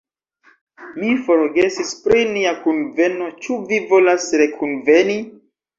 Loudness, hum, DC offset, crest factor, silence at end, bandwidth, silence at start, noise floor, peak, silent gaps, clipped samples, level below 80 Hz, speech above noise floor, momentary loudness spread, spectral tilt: -17 LUFS; none; under 0.1%; 16 dB; 0.45 s; 7.8 kHz; 0.8 s; -56 dBFS; -2 dBFS; none; under 0.1%; -56 dBFS; 40 dB; 11 LU; -4 dB/octave